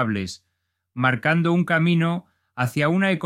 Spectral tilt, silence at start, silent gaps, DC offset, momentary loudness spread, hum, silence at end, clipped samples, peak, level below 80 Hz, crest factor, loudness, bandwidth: -6.5 dB/octave; 0 s; none; under 0.1%; 16 LU; none; 0 s; under 0.1%; -4 dBFS; -62 dBFS; 18 dB; -21 LUFS; 14 kHz